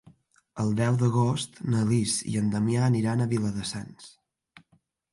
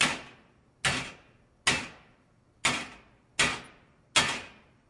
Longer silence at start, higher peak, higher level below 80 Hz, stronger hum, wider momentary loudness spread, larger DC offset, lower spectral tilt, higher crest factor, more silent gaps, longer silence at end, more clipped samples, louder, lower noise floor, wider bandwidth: first, 0.55 s vs 0 s; second, -12 dBFS vs -6 dBFS; about the same, -58 dBFS vs -58 dBFS; neither; second, 10 LU vs 18 LU; neither; first, -6 dB/octave vs -1.5 dB/octave; second, 14 dB vs 28 dB; neither; first, 1.05 s vs 0.4 s; neither; first, -26 LUFS vs -29 LUFS; first, -68 dBFS vs -64 dBFS; about the same, 11.5 kHz vs 11.5 kHz